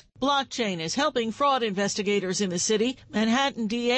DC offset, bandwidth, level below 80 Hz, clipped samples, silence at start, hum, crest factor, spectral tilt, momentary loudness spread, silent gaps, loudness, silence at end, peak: under 0.1%; 8.8 kHz; -62 dBFS; under 0.1%; 0.2 s; none; 14 dB; -3.5 dB/octave; 4 LU; none; -25 LUFS; 0 s; -12 dBFS